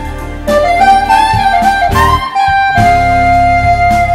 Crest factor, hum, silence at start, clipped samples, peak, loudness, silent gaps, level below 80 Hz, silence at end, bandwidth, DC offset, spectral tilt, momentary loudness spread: 8 dB; none; 0 s; 0.1%; 0 dBFS; -9 LUFS; none; -22 dBFS; 0 s; 16.5 kHz; under 0.1%; -5 dB/octave; 4 LU